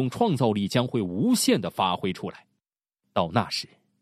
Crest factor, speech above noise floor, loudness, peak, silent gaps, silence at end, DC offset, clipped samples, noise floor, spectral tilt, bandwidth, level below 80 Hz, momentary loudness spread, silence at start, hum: 20 dB; 59 dB; -25 LUFS; -6 dBFS; none; 0.35 s; under 0.1%; under 0.1%; -84 dBFS; -5 dB/octave; 15 kHz; -62 dBFS; 9 LU; 0 s; none